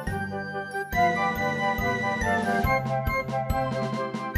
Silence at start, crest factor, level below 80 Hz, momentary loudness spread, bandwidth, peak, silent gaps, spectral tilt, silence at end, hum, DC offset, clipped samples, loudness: 0 s; 16 dB; -40 dBFS; 7 LU; 14.5 kHz; -10 dBFS; none; -6 dB/octave; 0 s; none; under 0.1%; under 0.1%; -26 LUFS